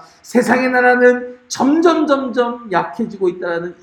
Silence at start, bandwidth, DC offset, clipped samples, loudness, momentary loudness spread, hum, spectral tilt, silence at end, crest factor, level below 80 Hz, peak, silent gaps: 0.25 s; 13.5 kHz; under 0.1%; under 0.1%; -15 LUFS; 10 LU; none; -4.5 dB/octave; 0.1 s; 16 dB; -62 dBFS; 0 dBFS; none